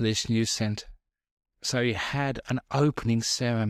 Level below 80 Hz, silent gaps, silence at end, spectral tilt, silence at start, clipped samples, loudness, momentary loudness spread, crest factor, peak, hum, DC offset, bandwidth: -52 dBFS; 1.31-1.37 s; 0 s; -4.5 dB/octave; 0 s; under 0.1%; -27 LUFS; 6 LU; 16 dB; -10 dBFS; none; under 0.1%; 15 kHz